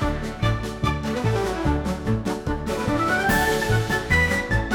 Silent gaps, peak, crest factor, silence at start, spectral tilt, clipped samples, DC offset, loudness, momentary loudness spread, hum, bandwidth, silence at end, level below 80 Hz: none; -6 dBFS; 16 dB; 0 s; -5.5 dB/octave; under 0.1%; under 0.1%; -23 LUFS; 6 LU; none; 19 kHz; 0 s; -32 dBFS